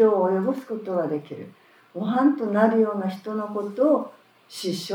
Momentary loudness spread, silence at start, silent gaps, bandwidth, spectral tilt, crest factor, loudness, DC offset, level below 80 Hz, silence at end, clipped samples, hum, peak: 19 LU; 0 s; none; 19 kHz; -6.5 dB/octave; 18 dB; -24 LUFS; under 0.1%; -86 dBFS; 0 s; under 0.1%; none; -6 dBFS